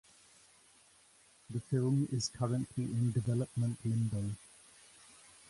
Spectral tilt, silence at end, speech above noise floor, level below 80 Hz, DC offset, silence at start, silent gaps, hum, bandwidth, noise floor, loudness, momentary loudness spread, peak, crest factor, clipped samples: -6.5 dB/octave; 1.05 s; 31 dB; -64 dBFS; under 0.1%; 1.5 s; none; none; 11.5 kHz; -65 dBFS; -35 LUFS; 24 LU; -20 dBFS; 16 dB; under 0.1%